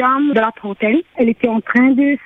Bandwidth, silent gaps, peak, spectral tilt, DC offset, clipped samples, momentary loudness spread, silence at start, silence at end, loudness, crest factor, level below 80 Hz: 4 kHz; none; -2 dBFS; -8 dB/octave; under 0.1%; under 0.1%; 6 LU; 0 s; 0.1 s; -15 LUFS; 14 dB; -58 dBFS